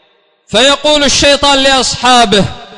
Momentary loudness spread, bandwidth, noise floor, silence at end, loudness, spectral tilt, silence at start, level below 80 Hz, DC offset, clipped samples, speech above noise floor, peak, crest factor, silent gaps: 3 LU; 11 kHz; -50 dBFS; 0 s; -7 LUFS; -2.5 dB/octave; 0.5 s; -32 dBFS; under 0.1%; under 0.1%; 41 dB; 0 dBFS; 10 dB; none